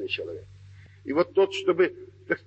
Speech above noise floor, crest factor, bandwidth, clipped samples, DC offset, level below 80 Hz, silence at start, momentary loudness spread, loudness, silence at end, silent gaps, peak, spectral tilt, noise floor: 23 dB; 16 dB; 8.2 kHz; under 0.1%; under 0.1%; -66 dBFS; 0 s; 19 LU; -26 LUFS; 0.1 s; none; -10 dBFS; -5.5 dB/octave; -49 dBFS